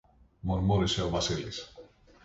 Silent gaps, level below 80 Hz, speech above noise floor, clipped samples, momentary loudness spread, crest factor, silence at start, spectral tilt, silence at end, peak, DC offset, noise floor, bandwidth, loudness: none; -44 dBFS; 25 dB; under 0.1%; 14 LU; 16 dB; 0.45 s; -5 dB/octave; 0.4 s; -16 dBFS; under 0.1%; -54 dBFS; 8 kHz; -30 LUFS